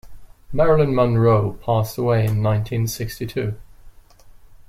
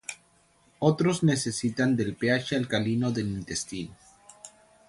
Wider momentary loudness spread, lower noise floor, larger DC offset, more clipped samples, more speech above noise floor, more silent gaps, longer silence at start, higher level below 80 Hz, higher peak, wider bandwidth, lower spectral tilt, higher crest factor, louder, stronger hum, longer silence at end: second, 11 LU vs 23 LU; second, -45 dBFS vs -63 dBFS; neither; neither; second, 27 dB vs 37 dB; neither; about the same, 0.05 s vs 0.1 s; first, -40 dBFS vs -58 dBFS; first, -4 dBFS vs -8 dBFS; first, 15.5 kHz vs 11.5 kHz; first, -7 dB/octave vs -5 dB/octave; about the same, 16 dB vs 20 dB; first, -20 LUFS vs -27 LUFS; neither; about the same, 0.3 s vs 0.4 s